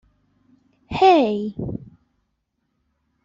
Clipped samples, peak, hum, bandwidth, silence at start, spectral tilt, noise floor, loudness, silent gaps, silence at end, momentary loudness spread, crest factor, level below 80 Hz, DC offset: under 0.1%; -4 dBFS; none; 7.6 kHz; 0.9 s; -7 dB/octave; -73 dBFS; -19 LUFS; none; 1.35 s; 17 LU; 20 dB; -52 dBFS; under 0.1%